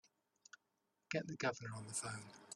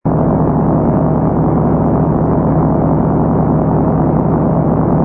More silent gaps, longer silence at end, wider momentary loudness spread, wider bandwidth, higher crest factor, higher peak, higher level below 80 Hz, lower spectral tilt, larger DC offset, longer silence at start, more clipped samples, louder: neither; about the same, 0 s vs 0 s; first, 21 LU vs 1 LU; first, 13 kHz vs 2.5 kHz; first, 22 dB vs 12 dB; second, -24 dBFS vs 0 dBFS; second, -80 dBFS vs -26 dBFS; second, -3.5 dB/octave vs -13.5 dB/octave; neither; first, 1.1 s vs 0.05 s; neither; second, -44 LUFS vs -13 LUFS